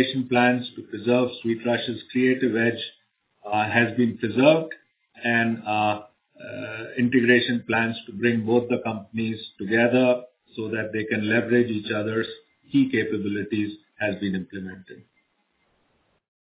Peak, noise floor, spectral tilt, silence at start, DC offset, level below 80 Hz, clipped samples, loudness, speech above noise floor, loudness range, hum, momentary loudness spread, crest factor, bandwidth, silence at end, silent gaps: -4 dBFS; -70 dBFS; -10 dB/octave; 0 s; under 0.1%; -62 dBFS; under 0.1%; -23 LUFS; 47 dB; 4 LU; none; 15 LU; 20 dB; 4 kHz; 1.5 s; none